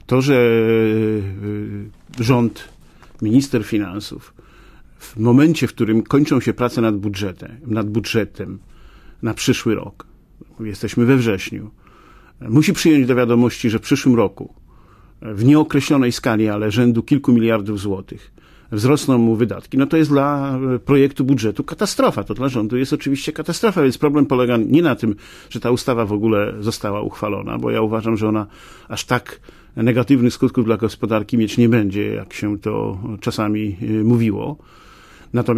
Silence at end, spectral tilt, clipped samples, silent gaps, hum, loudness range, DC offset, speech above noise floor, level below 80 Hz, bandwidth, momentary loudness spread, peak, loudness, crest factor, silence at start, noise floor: 0 s; -6.5 dB/octave; under 0.1%; none; none; 5 LU; under 0.1%; 29 dB; -46 dBFS; 15.5 kHz; 13 LU; -2 dBFS; -18 LUFS; 16 dB; 0.1 s; -46 dBFS